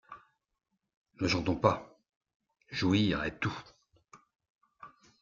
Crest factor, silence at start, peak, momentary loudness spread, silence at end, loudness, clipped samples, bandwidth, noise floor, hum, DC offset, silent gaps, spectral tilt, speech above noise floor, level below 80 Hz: 26 dB; 0.1 s; -10 dBFS; 17 LU; 0.35 s; -31 LUFS; under 0.1%; 7.6 kHz; -84 dBFS; none; under 0.1%; 0.97-1.05 s, 2.16-2.21 s, 2.34-2.40 s, 4.50-4.59 s; -6 dB/octave; 53 dB; -60 dBFS